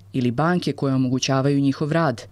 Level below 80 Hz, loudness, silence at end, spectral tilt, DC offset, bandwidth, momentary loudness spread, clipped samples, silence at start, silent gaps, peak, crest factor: -58 dBFS; -21 LUFS; 0.05 s; -6 dB/octave; under 0.1%; 12 kHz; 3 LU; under 0.1%; 0.15 s; none; -8 dBFS; 14 dB